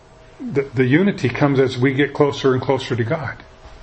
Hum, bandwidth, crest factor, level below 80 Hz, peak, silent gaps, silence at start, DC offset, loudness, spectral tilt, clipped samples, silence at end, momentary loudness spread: none; 8.6 kHz; 18 dB; -48 dBFS; 0 dBFS; none; 0.4 s; under 0.1%; -18 LUFS; -7 dB/octave; under 0.1%; 0.05 s; 9 LU